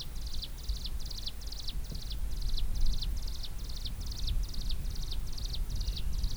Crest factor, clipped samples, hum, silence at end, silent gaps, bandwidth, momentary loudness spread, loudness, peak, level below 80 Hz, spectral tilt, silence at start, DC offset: 16 dB; under 0.1%; none; 0 s; none; over 20 kHz; 4 LU; -39 LUFS; -16 dBFS; -34 dBFS; -4 dB/octave; 0 s; under 0.1%